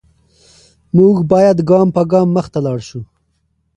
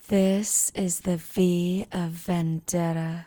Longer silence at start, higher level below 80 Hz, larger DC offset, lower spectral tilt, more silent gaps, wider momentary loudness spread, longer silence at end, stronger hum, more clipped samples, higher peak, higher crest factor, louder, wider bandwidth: first, 0.95 s vs 0.1 s; first, -48 dBFS vs -56 dBFS; neither; first, -9 dB/octave vs -5 dB/octave; neither; first, 13 LU vs 6 LU; first, 0.75 s vs 0 s; neither; neither; first, 0 dBFS vs -10 dBFS; about the same, 14 dB vs 16 dB; first, -13 LUFS vs -25 LUFS; second, 9.8 kHz vs over 20 kHz